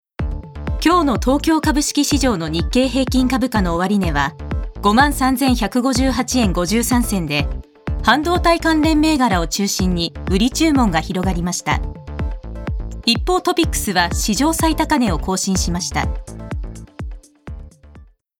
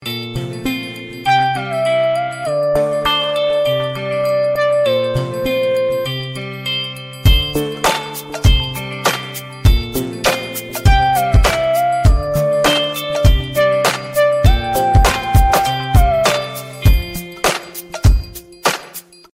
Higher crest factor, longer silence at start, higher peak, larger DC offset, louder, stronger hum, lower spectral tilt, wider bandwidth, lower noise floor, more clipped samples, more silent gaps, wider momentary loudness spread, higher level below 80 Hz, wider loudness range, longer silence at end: about the same, 16 dB vs 14 dB; first, 0.2 s vs 0 s; about the same, 0 dBFS vs 0 dBFS; neither; about the same, -17 LUFS vs -16 LUFS; neither; about the same, -4.5 dB/octave vs -4.5 dB/octave; first, 18.5 kHz vs 16.5 kHz; first, -44 dBFS vs -36 dBFS; neither; neither; first, 13 LU vs 10 LU; second, -28 dBFS vs -20 dBFS; about the same, 3 LU vs 3 LU; about the same, 0.35 s vs 0.35 s